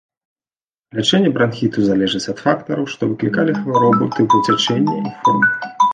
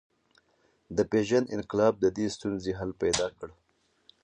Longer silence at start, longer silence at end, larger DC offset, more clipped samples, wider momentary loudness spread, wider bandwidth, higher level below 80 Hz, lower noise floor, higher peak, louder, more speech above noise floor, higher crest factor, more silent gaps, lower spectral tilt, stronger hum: about the same, 0.95 s vs 0.9 s; second, 0 s vs 0.7 s; neither; neither; second, 6 LU vs 9 LU; second, 9.6 kHz vs 11 kHz; about the same, -56 dBFS vs -56 dBFS; first, under -90 dBFS vs -69 dBFS; first, -2 dBFS vs -10 dBFS; first, -16 LUFS vs -29 LUFS; first, over 74 dB vs 41 dB; about the same, 16 dB vs 20 dB; neither; about the same, -5.5 dB/octave vs -4.5 dB/octave; neither